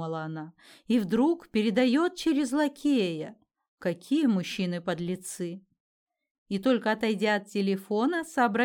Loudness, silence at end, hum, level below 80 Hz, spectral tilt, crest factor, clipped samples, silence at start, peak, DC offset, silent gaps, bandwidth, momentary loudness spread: -28 LUFS; 0 s; none; -68 dBFS; -5.5 dB/octave; 16 dB; under 0.1%; 0 s; -12 dBFS; under 0.1%; 3.68-3.77 s, 5.80-6.07 s, 6.31-6.46 s; 18 kHz; 11 LU